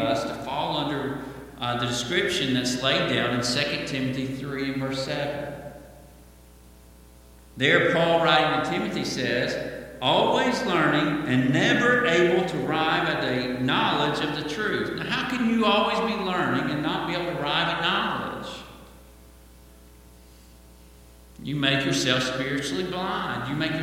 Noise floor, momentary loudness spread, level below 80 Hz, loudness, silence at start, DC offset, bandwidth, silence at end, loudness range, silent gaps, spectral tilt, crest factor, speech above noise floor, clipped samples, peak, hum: -50 dBFS; 11 LU; -52 dBFS; -24 LUFS; 0 s; under 0.1%; 16.5 kHz; 0 s; 9 LU; none; -4.5 dB/octave; 20 dB; 26 dB; under 0.1%; -4 dBFS; none